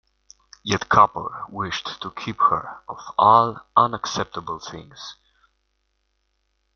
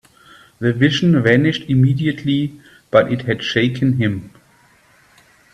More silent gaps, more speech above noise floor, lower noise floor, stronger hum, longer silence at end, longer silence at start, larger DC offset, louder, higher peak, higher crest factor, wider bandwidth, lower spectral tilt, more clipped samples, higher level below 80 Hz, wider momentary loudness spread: neither; first, 50 dB vs 37 dB; first, -71 dBFS vs -53 dBFS; neither; first, 1.65 s vs 1.25 s; about the same, 0.65 s vs 0.6 s; neither; second, -21 LUFS vs -17 LUFS; about the same, -2 dBFS vs 0 dBFS; about the same, 22 dB vs 18 dB; second, 7.2 kHz vs 8.8 kHz; second, -4 dB/octave vs -7 dB/octave; neither; about the same, -56 dBFS vs -52 dBFS; first, 21 LU vs 8 LU